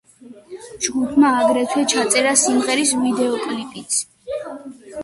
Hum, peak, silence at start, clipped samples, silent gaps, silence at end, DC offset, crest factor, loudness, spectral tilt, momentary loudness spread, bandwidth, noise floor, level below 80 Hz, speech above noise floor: none; 0 dBFS; 0.25 s; under 0.1%; none; 0 s; under 0.1%; 18 dB; -18 LUFS; -2 dB/octave; 20 LU; 12 kHz; -43 dBFS; -60 dBFS; 25 dB